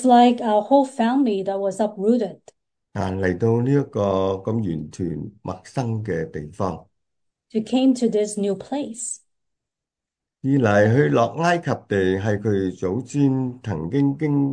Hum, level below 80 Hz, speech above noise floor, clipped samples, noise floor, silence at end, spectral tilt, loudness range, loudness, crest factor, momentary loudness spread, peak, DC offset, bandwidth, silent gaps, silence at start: none; -56 dBFS; 66 dB; under 0.1%; -87 dBFS; 0 s; -6.5 dB/octave; 5 LU; -22 LUFS; 18 dB; 12 LU; -4 dBFS; under 0.1%; 10 kHz; none; 0 s